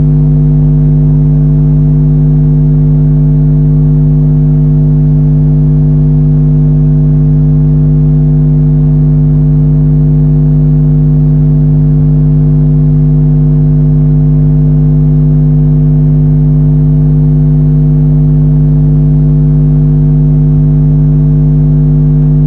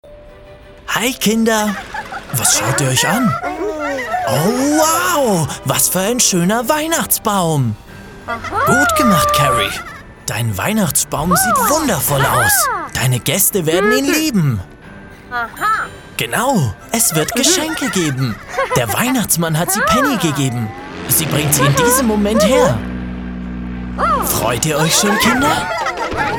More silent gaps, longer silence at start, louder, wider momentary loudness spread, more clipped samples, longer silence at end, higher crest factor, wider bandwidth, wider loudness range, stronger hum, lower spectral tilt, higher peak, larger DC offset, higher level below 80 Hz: neither; about the same, 0 s vs 0.05 s; first, -7 LUFS vs -14 LUFS; second, 0 LU vs 12 LU; neither; about the same, 0 s vs 0 s; second, 6 dB vs 16 dB; second, 1.6 kHz vs 19 kHz; about the same, 0 LU vs 2 LU; first, 50 Hz at -5 dBFS vs none; first, -13.5 dB/octave vs -3.5 dB/octave; about the same, 0 dBFS vs 0 dBFS; neither; first, -16 dBFS vs -36 dBFS